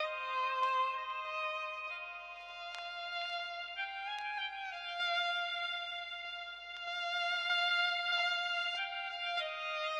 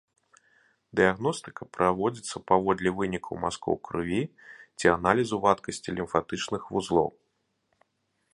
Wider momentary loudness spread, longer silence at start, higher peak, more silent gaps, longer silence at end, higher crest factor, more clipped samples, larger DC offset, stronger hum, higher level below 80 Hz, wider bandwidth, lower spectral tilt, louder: about the same, 11 LU vs 10 LU; second, 0 s vs 0.95 s; second, -22 dBFS vs -4 dBFS; neither; second, 0 s vs 1.25 s; second, 16 dB vs 24 dB; neither; neither; neither; second, -76 dBFS vs -56 dBFS; about the same, 11 kHz vs 11.5 kHz; second, 1.5 dB/octave vs -5 dB/octave; second, -36 LUFS vs -28 LUFS